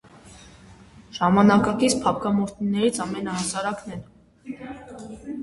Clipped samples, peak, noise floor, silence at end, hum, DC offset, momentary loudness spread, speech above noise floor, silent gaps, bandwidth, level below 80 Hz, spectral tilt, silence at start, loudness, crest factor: under 0.1%; -4 dBFS; -48 dBFS; 0 s; none; under 0.1%; 21 LU; 26 dB; none; 11.5 kHz; -52 dBFS; -5 dB/octave; 0.15 s; -22 LUFS; 20 dB